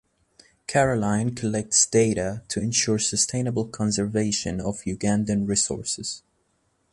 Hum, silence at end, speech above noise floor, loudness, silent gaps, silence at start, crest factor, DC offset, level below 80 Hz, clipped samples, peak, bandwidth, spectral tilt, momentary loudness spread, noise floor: none; 0.75 s; 45 dB; -23 LUFS; none; 0.7 s; 20 dB; under 0.1%; -50 dBFS; under 0.1%; -6 dBFS; 11.5 kHz; -4 dB/octave; 9 LU; -69 dBFS